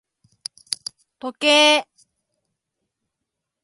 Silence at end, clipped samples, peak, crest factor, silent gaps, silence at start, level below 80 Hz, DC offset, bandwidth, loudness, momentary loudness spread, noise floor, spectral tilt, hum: 1.8 s; under 0.1%; -2 dBFS; 22 dB; none; 0.7 s; -78 dBFS; under 0.1%; 11.5 kHz; -17 LUFS; 23 LU; -82 dBFS; 0.5 dB/octave; none